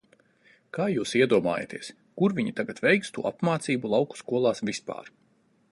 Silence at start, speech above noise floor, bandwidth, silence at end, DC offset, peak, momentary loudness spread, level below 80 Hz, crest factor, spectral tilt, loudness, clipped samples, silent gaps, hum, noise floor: 0.75 s; 39 dB; 11.5 kHz; 0.65 s; under 0.1%; -8 dBFS; 15 LU; -68 dBFS; 20 dB; -5.5 dB/octave; -26 LUFS; under 0.1%; none; none; -65 dBFS